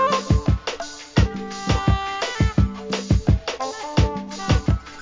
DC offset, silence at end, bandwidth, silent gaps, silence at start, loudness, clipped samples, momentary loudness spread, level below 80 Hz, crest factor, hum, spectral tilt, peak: under 0.1%; 0 s; 7.6 kHz; none; 0 s; -22 LUFS; under 0.1%; 8 LU; -26 dBFS; 18 dB; none; -6 dB/octave; -4 dBFS